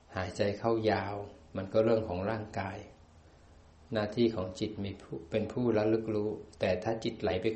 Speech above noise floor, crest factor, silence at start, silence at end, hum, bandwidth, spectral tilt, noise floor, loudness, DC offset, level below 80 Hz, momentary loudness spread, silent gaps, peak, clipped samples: 26 dB; 18 dB; 0.1 s; 0 s; none; 8.4 kHz; -7 dB/octave; -58 dBFS; -33 LUFS; under 0.1%; -60 dBFS; 11 LU; none; -14 dBFS; under 0.1%